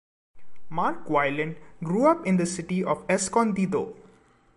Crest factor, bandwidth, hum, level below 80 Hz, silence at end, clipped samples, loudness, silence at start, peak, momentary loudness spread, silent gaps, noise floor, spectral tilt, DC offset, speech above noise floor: 20 dB; 11.5 kHz; none; -62 dBFS; 0 s; under 0.1%; -25 LUFS; 0.35 s; -8 dBFS; 10 LU; none; -58 dBFS; -5.5 dB/octave; under 0.1%; 33 dB